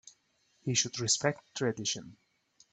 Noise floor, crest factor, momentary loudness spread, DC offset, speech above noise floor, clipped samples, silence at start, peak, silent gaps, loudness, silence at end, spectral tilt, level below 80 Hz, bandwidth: -72 dBFS; 22 dB; 8 LU; under 0.1%; 40 dB; under 0.1%; 0.05 s; -12 dBFS; none; -31 LUFS; 0.6 s; -2.5 dB/octave; -72 dBFS; 9.4 kHz